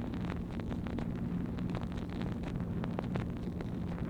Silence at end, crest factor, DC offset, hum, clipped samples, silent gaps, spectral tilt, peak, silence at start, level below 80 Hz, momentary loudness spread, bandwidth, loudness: 0 s; 18 dB; under 0.1%; none; under 0.1%; none; -8.5 dB/octave; -20 dBFS; 0 s; -46 dBFS; 2 LU; 9.6 kHz; -38 LUFS